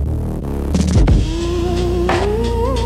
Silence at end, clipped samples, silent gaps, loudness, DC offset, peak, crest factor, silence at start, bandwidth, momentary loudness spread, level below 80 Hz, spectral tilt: 0 s; under 0.1%; none; -17 LUFS; under 0.1%; -4 dBFS; 12 dB; 0 s; 13 kHz; 8 LU; -20 dBFS; -6.5 dB/octave